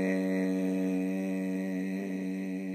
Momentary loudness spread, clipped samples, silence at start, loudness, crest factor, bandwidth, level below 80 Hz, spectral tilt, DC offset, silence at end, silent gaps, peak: 5 LU; under 0.1%; 0 s; -32 LUFS; 12 dB; 15.5 kHz; -80 dBFS; -7.5 dB/octave; under 0.1%; 0 s; none; -18 dBFS